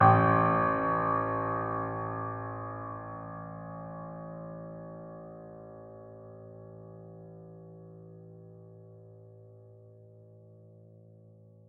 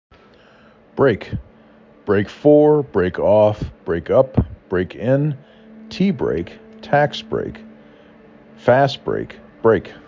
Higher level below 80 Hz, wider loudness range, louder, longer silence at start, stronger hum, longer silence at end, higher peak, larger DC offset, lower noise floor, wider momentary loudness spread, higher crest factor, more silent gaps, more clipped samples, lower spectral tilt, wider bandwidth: second, -62 dBFS vs -40 dBFS; first, 21 LU vs 5 LU; second, -31 LUFS vs -18 LUFS; second, 0 s vs 0.95 s; neither; first, 0.75 s vs 0.15 s; second, -8 dBFS vs -2 dBFS; neither; first, -56 dBFS vs -49 dBFS; first, 25 LU vs 18 LU; first, 26 dB vs 18 dB; neither; neither; about the same, -7.5 dB/octave vs -8 dB/octave; second, 4.2 kHz vs 7.4 kHz